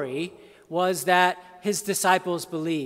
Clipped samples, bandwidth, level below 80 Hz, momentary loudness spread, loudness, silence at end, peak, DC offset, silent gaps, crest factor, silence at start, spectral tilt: under 0.1%; 16 kHz; -72 dBFS; 11 LU; -24 LUFS; 0 s; -4 dBFS; under 0.1%; none; 20 dB; 0 s; -3.5 dB/octave